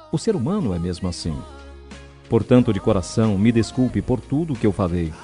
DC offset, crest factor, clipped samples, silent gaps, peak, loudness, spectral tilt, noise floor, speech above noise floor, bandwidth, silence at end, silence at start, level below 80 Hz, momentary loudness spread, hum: under 0.1%; 18 dB; under 0.1%; none; -2 dBFS; -21 LUFS; -7 dB/octave; -41 dBFS; 21 dB; 10.5 kHz; 0 s; 0 s; -42 dBFS; 18 LU; none